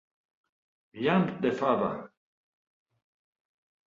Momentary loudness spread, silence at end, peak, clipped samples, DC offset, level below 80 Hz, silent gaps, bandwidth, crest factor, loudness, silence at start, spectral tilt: 7 LU; 1.8 s; -12 dBFS; under 0.1%; under 0.1%; -70 dBFS; none; 7.4 kHz; 20 dB; -28 LUFS; 0.95 s; -8 dB/octave